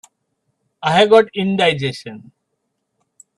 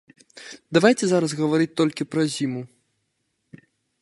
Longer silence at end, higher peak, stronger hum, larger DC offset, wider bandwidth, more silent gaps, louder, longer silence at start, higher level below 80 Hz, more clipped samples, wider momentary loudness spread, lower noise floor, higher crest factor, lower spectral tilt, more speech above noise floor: second, 1.2 s vs 1.35 s; about the same, 0 dBFS vs -2 dBFS; neither; neither; about the same, 11 kHz vs 11.5 kHz; neither; first, -15 LUFS vs -22 LUFS; first, 0.8 s vs 0.35 s; first, -60 dBFS vs -70 dBFS; neither; second, 17 LU vs 23 LU; about the same, -73 dBFS vs -74 dBFS; about the same, 18 dB vs 22 dB; about the same, -5.5 dB/octave vs -5 dB/octave; first, 58 dB vs 53 dB